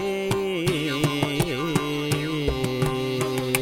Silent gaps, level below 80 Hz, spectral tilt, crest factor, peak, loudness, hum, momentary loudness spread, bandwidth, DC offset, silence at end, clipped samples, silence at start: none; -42 dBFS; -5 dB/octave; 22 dB; -2 dBFS; -25 LUFS; none; 2 LU; 18 kHz; under 0.1%; 0 s; under 0.1%; 0 s